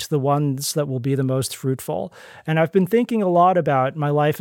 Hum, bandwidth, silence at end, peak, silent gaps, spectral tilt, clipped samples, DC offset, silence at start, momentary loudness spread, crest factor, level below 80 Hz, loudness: none; 17 kHz; 0 s; -6 dBFS; none; -6 dB/octave; under 0.1%; under 0.1%; 0 s; 9 LU; 14 dB; -66 dBFS; -20 LUFS